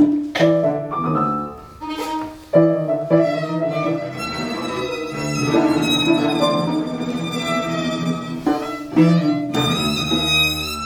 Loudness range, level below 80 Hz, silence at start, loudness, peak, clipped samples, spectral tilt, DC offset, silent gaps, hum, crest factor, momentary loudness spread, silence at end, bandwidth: 2 LU; -46 dBFS; 0 s; -19 LUFS; -2 dBFS; under 0.1%; -5.5 dB/octave; under 0.1%; none; none; 18 dB; 9 LU; 0 s; over 20 kHz